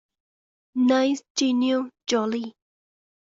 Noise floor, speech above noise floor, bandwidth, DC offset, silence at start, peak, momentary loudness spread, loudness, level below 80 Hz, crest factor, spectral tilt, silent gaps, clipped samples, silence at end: under -90 dBFS; over 67 dB; 7.8 kHz; under 0.1%; 0.75 s; -10 dBFS; 11 LU; -24 LUFS; -72 dBFS; 16 dB; -3.5 dB/octave; 1.30-1.35 s; under 0.1%; 0.75 s